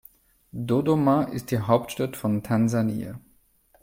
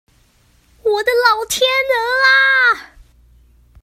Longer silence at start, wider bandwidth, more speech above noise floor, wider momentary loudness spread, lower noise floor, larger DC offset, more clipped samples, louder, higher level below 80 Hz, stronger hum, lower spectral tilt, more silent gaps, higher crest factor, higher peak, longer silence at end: second, 0.55 s vs 0.85 s; about the same, 16.5 kHz vs 16 kHz; about the same, 38 dB vs 40 dB; first, 14 LU vs 9 LU; first, -61 dBFS vs -54 dBFS; neither; neither; second, -25 LUFS vs -13 LUFS; second, -58 dBFS vs -50 dBFS; neither; first, -7.5 dB/octave vs 0.5 dB/octave; neither; about the same, 20 dB vs 16 dB; second, -6 dBFS vs 0 dBFS; second, 0.65 s vs 1 s